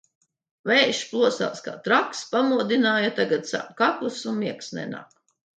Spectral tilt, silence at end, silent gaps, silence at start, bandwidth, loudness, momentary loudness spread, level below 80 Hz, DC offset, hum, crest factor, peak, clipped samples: -3.5 dB/octave; 0.5 s; none; 0.65 s; 9.2 kHz; -23 LUFS; 13 LU; -76 dBFS; under 0.1%; none; 20 dB; -6 dBFS; under 0.1%